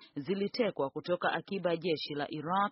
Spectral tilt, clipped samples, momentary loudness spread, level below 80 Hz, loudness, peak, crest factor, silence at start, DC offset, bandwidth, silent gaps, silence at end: -3.5 dB/octave; under 0.1%; 5 LU; -76 dBFS; -34 LUFS; -18 dBFS; 16 dB; 0 s; under 0.1%; 5.8 kHz; none; 0 s